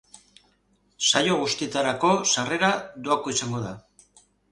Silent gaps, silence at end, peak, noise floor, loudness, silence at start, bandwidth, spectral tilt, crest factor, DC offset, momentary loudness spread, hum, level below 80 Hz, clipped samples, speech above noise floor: none; 0.75 s; -2 dBFS; -66 dBFS; -23 LUFS; 1 s; 11.5 kHz; -2.5 dB/octave; 24 dB; under 0.1%; 10 LU; 50 Hz at -55 dBFS; -62 dBFS; under 0.1%; 42 dB